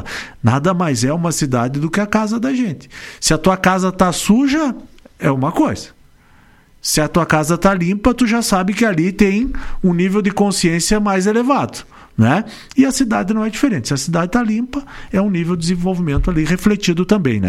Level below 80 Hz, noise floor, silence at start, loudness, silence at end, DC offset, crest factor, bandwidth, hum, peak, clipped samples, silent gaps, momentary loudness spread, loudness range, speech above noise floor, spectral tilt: -32 dBFS; -48 dBFS; 0 s; -16 LUFS; 0 s; under 0.1%; 16 dB; 15.5 kHz; none; 0 dBFS; under 0.1%; none; 7 LU; 2 LU; 32 dB; -5 dB/octave